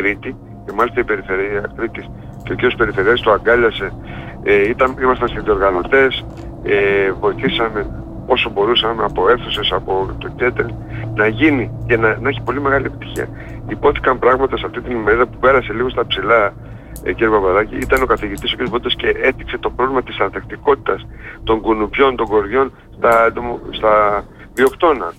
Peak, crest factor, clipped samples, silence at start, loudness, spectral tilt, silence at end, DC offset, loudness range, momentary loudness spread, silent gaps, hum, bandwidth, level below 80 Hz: -2 dBFS; 14 dB; under 0.1%; 0 s; -16 LUFS; -6 dB/octave; 0.05 s; under 0.1%; 2 LU; 12 LU; none; none; 15 kHz; -34 dBFS